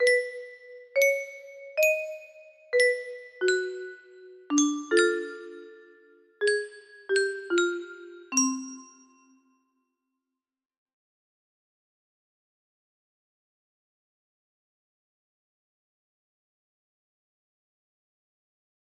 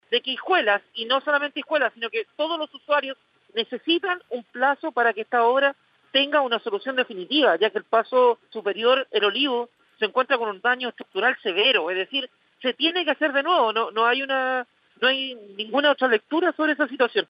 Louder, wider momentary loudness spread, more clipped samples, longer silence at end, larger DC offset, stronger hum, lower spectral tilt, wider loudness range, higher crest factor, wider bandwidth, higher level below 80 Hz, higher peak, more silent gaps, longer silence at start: second, -26 LUFS vs -23 LUFS; first, 20 LU vs 9 LU; neither; first, 10.15 s vs 0.05 s; neither; neither; second, -0.5 dB/octave vs -5 dB/octave; first, 6 LU vs 3 LU; about the same, 22 dB vs 18 dB; first, 13 kHz vs 5.4 kHz; about the same, -80 dBFS vs -80 dBFS; about the same, -8 dBFS vs -6 dBFS; neither; about the same, 0 s vs 0.1 s